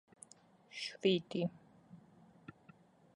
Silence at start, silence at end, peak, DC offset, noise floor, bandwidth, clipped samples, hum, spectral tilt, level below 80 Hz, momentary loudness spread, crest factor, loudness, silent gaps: 0.75 s; 1.2 s; -18 dBFS; under 0.1%; -65 dBFS; 11.5 kHz; under 0.1%; none; -5.5 dB/octave; -80 dBFS; 27 LU; 24 dB; -37 LUFS; none